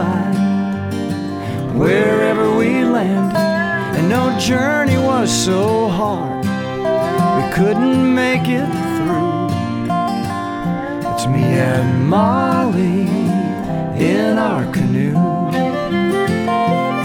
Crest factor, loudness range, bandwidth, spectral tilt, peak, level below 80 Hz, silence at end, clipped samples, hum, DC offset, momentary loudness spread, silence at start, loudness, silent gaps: 12 dB; 2 LU; 17 kHz; -6 dB/octave; -4 dBFS; -44 dBFS; 0 s; under 0.1%; none; under 0.1%; 7 LU; 0 s; -16 LUFS; none